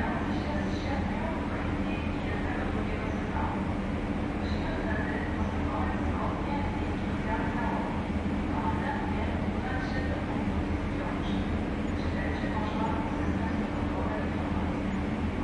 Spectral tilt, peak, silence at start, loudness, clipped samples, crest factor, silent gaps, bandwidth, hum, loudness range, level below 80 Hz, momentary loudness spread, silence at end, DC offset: -7.5 dB/octave; -16 dBFS; 0 s; -31 LUFS; under 0.1%; 12 dB; none; 10.5 kHz; none; 1 LU; -38 dBFS; 2 LU; 0 s; under 0.1%